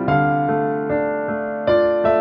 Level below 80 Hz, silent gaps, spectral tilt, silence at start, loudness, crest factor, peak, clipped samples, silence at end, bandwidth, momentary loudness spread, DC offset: -46 dBFS; none; -6 dB/octave; 0 s; -19 LUFS; 12 dB; -6 dBFS; under 0.1%; 0 s; 5.4 kHz; 6 LU; under 0.1%